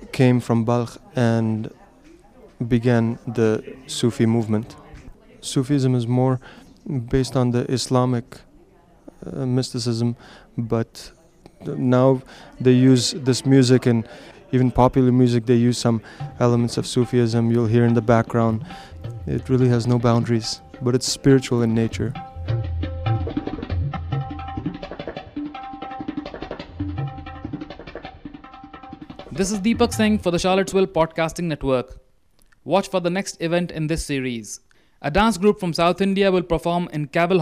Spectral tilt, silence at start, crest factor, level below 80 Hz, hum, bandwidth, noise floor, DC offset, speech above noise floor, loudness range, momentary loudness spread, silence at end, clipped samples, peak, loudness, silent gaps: -6.5 dB/octave; 0 s; 20 dB; -42 dBFS; none; 14 kHz; -58 dBFS; under 0.1%; 38 dB; 11 LU; 17 LU; 0 s; under 0.1%; -2 dBFS; -21 LUFS; none